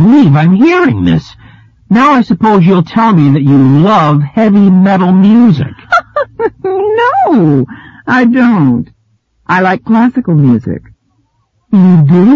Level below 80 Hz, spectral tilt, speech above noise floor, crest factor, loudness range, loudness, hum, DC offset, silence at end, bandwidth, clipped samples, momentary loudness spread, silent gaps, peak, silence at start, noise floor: -42 dBFS; -9 dB/octave; 50 dB; 8 dB; 4 LU; -8 LUFS; none; under 0.1%; 0 s; 7 kHz; 0.2%; 9 LU; none; 0 dBFS; 0 s; -57 dBFS